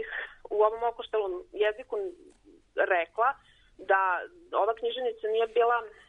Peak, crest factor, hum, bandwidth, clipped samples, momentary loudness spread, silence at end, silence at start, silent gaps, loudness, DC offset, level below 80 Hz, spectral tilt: -12 dBFS; 18 dB; none; 4 kHz; under 0.1%; 11 LU; 0.2 s; 0 s; none; -29 LUFS; under 0.1%; -64 dBFS; -4 dB/octave